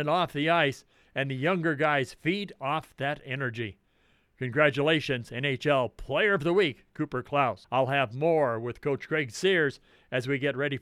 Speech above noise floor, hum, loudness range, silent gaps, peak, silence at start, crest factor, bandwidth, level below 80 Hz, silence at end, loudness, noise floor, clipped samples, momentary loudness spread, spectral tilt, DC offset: 39 dB; none; 3 LU; none; -8 dBFS; 0 s; 20 dB; 14.5 kHz; -60 dBFS; 0 s; -28 LUFS; -67 dBFS; under 0.1%; 9 LU; -6 dB/octave; under 0.1%